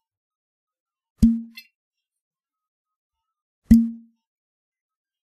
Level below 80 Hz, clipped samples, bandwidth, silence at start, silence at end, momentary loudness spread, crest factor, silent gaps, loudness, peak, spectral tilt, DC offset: -38 dBFS; under 0.1%; 13 kHz; 1.2 s; 1.25 s; 12 LU; 24 dB; 1.75-1.91 s, 2.21-2.31 s, 2.68-2.85 s, 2.96-3.10 s, 3.42-3.62 s; -20 LUFS; -2 dBFS; -8 dB/octave; under 0.1%